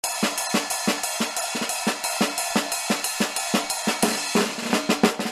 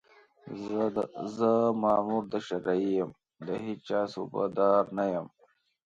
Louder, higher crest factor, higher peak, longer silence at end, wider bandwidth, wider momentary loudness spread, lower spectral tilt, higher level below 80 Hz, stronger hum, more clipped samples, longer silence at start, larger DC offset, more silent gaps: first, -23 LUFS vs -30 LUFS; about the same, 22 dB vs 18 dB; first, -4 dBFS vs -12 dBFS; second, 0 s vs 0.6 s; first, 15.5 kHz vs 7.8 kHz; second, 3 LU vs 12 LU; second, -2.5 dB/octave vs -7.5 dB/octave; first, -64 dBFS vs -70 dBFS; neither; neither; second, 0.05 s vs 0.45 s; neither; neither